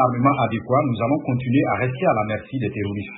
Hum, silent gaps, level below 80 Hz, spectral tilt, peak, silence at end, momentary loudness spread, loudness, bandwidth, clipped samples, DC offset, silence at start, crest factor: none; none; -54 dBFS; -12.5 dB/octave; -4 dBFS; 0 s; 7 LU; -21 LUFS; 4 kHz; under 0.1%; under 0.1%; 0 s; 16 dB